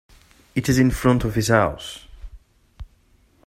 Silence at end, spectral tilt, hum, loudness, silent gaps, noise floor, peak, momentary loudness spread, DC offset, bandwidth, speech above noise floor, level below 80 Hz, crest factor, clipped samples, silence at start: 0.6 s; -6 dB/octave; none; -20 LUFS; none; -58 dBFS; -2 dBFS; 17 LU; under 0.1%; 16 kHz; 39 dB; -38 dBFS; 20 dB; under 0.1%; 0.55 s